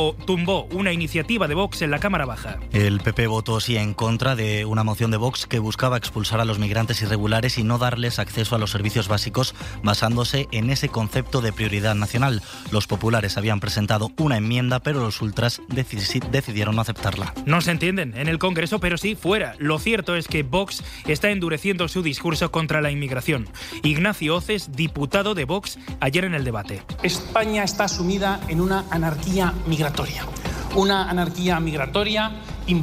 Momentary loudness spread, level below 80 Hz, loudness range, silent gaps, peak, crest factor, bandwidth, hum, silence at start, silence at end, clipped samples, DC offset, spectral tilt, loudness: 5 LU; -38 dBFS; 1 LU; none; -6 dBFS; 16 dB; 16 kHz; none; 0 s; 0 s; under 0.1%; under 0.1%; -5 dB/octave; -23 LUFS